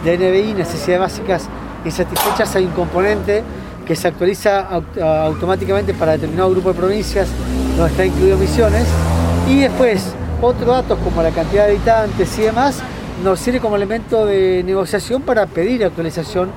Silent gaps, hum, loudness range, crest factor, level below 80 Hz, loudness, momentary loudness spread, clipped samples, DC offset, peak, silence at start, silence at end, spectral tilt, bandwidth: none; none; 3 LU; 14 dB; -28 dBFS; -16 LUFS; 7 LU; under 0.1%; under 0.1%; 0 dBFS; 0 s; 0 s; -6 dB/octave; 17 kHz